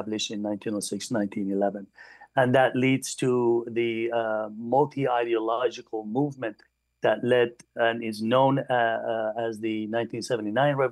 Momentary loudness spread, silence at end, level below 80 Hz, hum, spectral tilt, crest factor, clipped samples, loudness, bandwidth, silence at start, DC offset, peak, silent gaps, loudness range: 8 LU; 0 s; -74 dBFS; none; -5.5 dB/octave; 16 dB; under 0.1%; -26 LUFS; 12.5 kHz; 0 s; under 0.1%; -8 dBFS; none; 2 LU